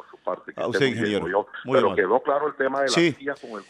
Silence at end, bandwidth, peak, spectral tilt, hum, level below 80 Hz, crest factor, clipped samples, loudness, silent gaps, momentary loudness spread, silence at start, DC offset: 0.05 s; 11.5 kHz; -6 dBFS; -4.5 dB/octave; none; -64 dBFS; 18 dB; under 0.1%; -23 LUFS; none; 11 LU; 0.15 s; under 0.1%